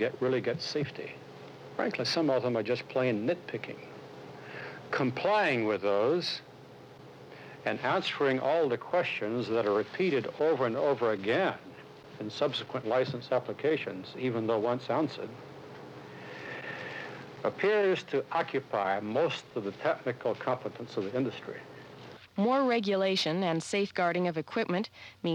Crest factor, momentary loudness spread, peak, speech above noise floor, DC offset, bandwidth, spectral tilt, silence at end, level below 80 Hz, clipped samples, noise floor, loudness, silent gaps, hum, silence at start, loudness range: 14 dB; 19 LU; -16 dBFS; 21 dB; under 0.1%; 11.5 kHz; -5.5 dB/octave; 0 s; -76 dBFS; under 0.1%; -51 dBFS; -31 LUFS; none; none; 0 s; 4 LU